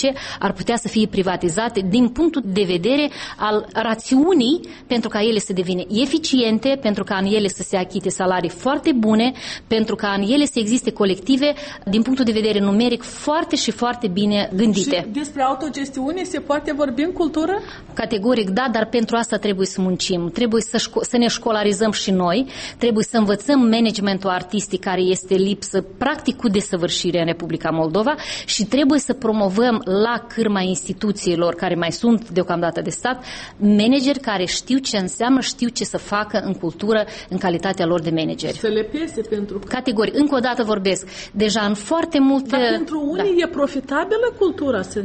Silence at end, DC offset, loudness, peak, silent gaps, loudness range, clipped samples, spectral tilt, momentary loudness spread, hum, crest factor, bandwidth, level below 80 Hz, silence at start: 0 s; under 0.1%; -19 LUFS; -6 dBFS; none; 2 LU; under 0.1%; -4.5 dB/octave; 6 LU; none; 14 dB; 8.8 kHz; -48 dBFS; 0 s